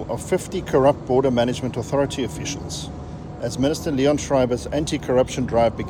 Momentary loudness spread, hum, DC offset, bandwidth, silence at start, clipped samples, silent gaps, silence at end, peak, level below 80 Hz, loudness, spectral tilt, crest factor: 11 LU; none; under 0.1%; 17 kHz; 0 s; under 0.1%; none; 0 s; -4 dBFS; -42 dBFS; -22 LUFS; -5.5 dB/octave; 16 dB